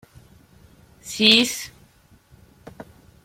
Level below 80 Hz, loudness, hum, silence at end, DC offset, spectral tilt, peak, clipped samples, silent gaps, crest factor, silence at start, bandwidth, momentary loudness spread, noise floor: -58 dBFS; -17 LUFS; none; 1.6 s; under 0.1%; -2 dB/octave; -2 dBFS; under 0.1%; none; 24 dB; 1.05 s; 16.5 kHz; 24 LU; -55 dBFS